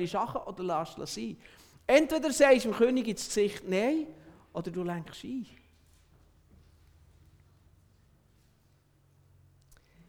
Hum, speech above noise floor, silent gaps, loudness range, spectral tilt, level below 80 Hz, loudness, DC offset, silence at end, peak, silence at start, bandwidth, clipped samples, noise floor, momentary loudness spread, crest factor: none; 37 dB; none; 16 LU; -4.5 dB/octave; -62 dBFS; -29 LUFS; under 0.1%; 4.65 s; -10 dBFS; 0 s; 19 kHz; under 0.1%; -66 dBFS; 17 LU; 22 dB